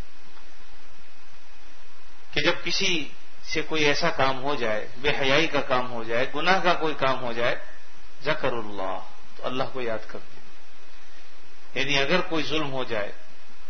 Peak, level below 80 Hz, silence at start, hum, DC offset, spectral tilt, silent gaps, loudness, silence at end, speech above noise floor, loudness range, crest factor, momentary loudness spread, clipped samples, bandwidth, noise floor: -2 dBFS; -50 dBFS; 0 s; none; 8%; -4 dB/octave; none; -26 LUFS; 0 s; 25 dB; 8 LU; 26 dB; 13 LU; under 0.1%; 6.6 kHz; -51 dBFS